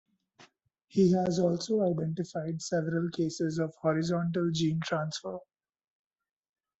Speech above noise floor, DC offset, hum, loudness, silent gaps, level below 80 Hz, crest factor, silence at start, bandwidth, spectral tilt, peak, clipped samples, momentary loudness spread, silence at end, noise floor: 34 dB; under 0.1%; none; -30 LUFS; none; -68 dBFS; 18 dB; 0.4 s; 8.2 kHz; -6.5 dB/octave; -14 dBFS; under 0.1%; 9 LU; 1.4 s; -63 dBFS